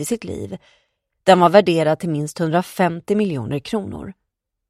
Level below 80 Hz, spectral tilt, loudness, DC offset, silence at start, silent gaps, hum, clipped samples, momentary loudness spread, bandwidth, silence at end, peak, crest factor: -54 dBFS; -6 dB/octave; -18 LUFS; under 0.1%; 0 s; none; none; under 0.1%; 19 LU; 15.5 kHz; 0.6 s; 0 dBFS; 20 dB